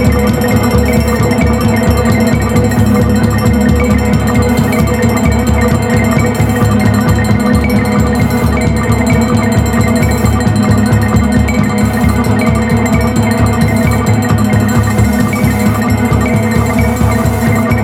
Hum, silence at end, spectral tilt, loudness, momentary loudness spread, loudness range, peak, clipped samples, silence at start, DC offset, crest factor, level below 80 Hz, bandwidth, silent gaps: none; 0 s; -6.5 dB/octave; -11 LUFS; 1 LU; 1 LU; 0 dBFS; under 0.1%; 0 s; under 0.1%; 10 dB; -20 dBFS; 16 kHz; none